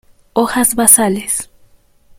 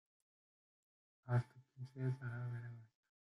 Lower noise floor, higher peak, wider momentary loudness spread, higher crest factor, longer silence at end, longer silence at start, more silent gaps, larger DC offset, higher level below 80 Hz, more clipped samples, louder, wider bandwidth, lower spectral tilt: second, -49 dBFS vs under -90 dBFS; first, 0 dBFS vs -26 dBFS; second, 12 LU vs 16 LU; about the same, 16 dB vs 20 dB; first, 0.75 s vs 0.45 s; second, 0.35 s vs 1.25 s; neither; neither; first, -46 dBFS vs -80 dBFS; first, 0.4% vs under 0.1%; first, -12 LUFS vs -44 LUFS; first, over 20 kHz vs 5.8 kHz; second, -2.5 dB/octave vs -9 dB/octave